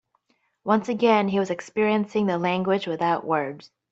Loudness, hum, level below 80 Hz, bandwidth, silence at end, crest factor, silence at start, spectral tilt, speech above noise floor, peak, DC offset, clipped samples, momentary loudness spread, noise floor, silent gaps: -23 LUFS; none; -68 dBFS; 8 kHz; 0.25 s; 18 dB; 0.65 s; -6.5 dB/octave; 46 dB; -6 dBFS; under 0.1%; under 0.1%; 7 LU; -69 dBFS; none